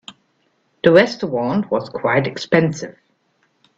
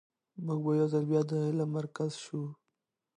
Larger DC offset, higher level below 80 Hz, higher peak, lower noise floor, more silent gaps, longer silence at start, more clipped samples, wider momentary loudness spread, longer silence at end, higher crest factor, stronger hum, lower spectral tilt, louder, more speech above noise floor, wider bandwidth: neither; first, -58 dBFS vs -80 dBFS; first, 0 dBFS vs -16 dBFS; second, -64 dBFS vs -85 dBFS; neither; second, 0.1 s vs 0.35 s; neither; about the same, 10 LU vs 12 LU; first, 0.85 s vs 0.65 s; about the same, 20 dB vs 16 dB; neither; second, -6 dB/octave vs -8 dB/octave; first, -17 LUFS vs -32 LUFS; second, 47 dB vs 54 dB; second, 8 kHz vs 10 kHz